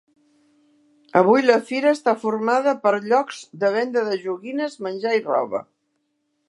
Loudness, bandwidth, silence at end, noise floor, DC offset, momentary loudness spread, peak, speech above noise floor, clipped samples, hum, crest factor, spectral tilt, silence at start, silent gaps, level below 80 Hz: -21 LUFS; 11.5 kHz; 0.85 s; -72 dBFS; under 0.1%; 11 LU; -2 dBFS; 52 dB; under 0.1%; none; 20 dB; -5.5 dB/octave; 1.15 s; none; -78 dBFS